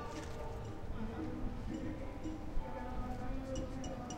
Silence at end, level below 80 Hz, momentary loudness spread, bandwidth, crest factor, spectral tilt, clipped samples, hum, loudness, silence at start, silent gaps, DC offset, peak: 0 s; -46 dBFS; 3 LU; 11.5 kHz; 14 dB; -6 dB/octave; under 0.1%; none; -44 LUFS; 0 s; none; under 0.1%; -26 dBFS